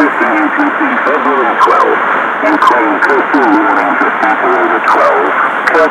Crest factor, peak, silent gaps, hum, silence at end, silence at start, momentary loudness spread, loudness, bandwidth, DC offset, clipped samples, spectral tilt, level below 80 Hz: 10 dB; 0 dBFS; none; none; 0 s; 0 s; 3 LU; -9 LUFS; 15.5 kHz; under 0.1%; under 0.1%; -4.5 dB/octave; -56 dBFS